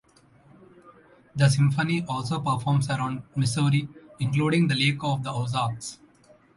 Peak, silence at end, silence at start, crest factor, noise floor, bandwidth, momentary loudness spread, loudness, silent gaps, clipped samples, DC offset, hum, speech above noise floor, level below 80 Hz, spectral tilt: -8 dBFS; 0.6 s; 0.85 s; 18 dB; -57 dBFS; 11.5 kHz; 9 LU; -25 LUFS; none; under 0.1%; under 0.1%; none; 33 dB; -58 dBFS; -5.5 dB/octave